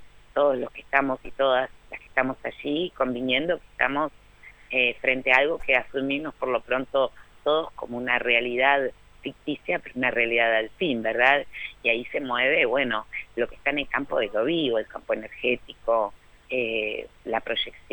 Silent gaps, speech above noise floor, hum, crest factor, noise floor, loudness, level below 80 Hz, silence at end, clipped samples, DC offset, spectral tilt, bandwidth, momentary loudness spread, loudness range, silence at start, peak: none; 25 dB; none; 22 dB; -50 dBFS; -25 LUFS; -54 dBFS; 0.15 s; under 0.1%; under 0.1%; -5.5 dB/octave; 19 kHz; 11 LU; 4 LU; 0 s; -4 dBFS